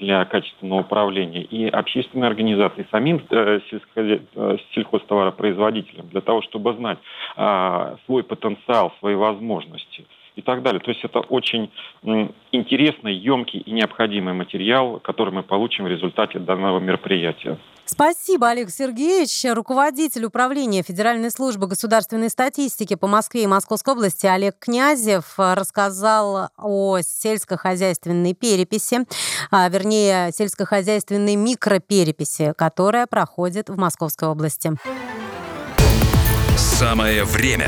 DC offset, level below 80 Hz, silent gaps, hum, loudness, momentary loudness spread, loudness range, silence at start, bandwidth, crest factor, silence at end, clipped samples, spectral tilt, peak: under 0.1%; -34 dBFS; none; none; -20 LUFS; 8 LU; 3 LU; 0 s; over 20 kHz; 16 dB; 0 s; under 0.1%; -4.5 dB/octave; -2 dBFS